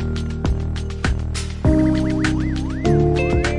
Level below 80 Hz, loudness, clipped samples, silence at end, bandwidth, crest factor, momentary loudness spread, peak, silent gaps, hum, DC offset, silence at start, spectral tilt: -26 dBFS; -20 LUFS; under 0.1%; 0 s; 11.5 kHz; 14 dB; 7 LU; -4 dBFS; none; none; under 0.1%; 0 s; -7 dB/octave